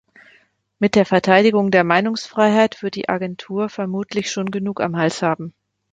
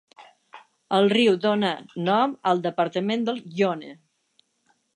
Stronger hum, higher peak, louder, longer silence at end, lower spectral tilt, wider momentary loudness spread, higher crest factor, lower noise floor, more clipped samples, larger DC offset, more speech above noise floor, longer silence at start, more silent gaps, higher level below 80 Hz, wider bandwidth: neither; first, 0 dBFS vs -8 dBFS; first, -18 LUFS vs -23 LUFS; second, 0.4 s vs 1 s; about the same, -5.5 dB/octave vs -6 dB/octave; about the same, 11 LU vs 9 LU; about the same, 18 dB vs 18 dB; second, -57 dBFS vs -68 dBFS; neither; neither; second, 39 dB vs 46 dB; first, 0.8 s vs 0.2 s; neither; first, -60 dBFS vs -76 dBFS; about the same, 9.2 kHz vs 10 kHz